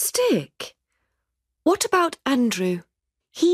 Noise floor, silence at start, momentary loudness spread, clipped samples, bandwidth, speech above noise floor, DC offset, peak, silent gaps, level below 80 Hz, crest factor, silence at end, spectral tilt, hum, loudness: -79 dBFS; 0 s; 17 LU; under 0.1%; 15.5 kHz; 58 dB; under 0.1%; -6 dBFS; none; -66 dBFS; 18 dB; 0 s; -3.5 dB/octave; none; -22 LUFS